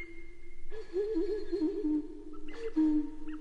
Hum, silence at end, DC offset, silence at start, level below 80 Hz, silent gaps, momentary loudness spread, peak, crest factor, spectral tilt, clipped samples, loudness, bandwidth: none; 0 s; under 0.1%; 0 s; -46 dBFS; none; 19 LU; -20 dBFS; 12 dB; -7.5 dB/octave; under 0.1%; -34 LUFS; 7 kHz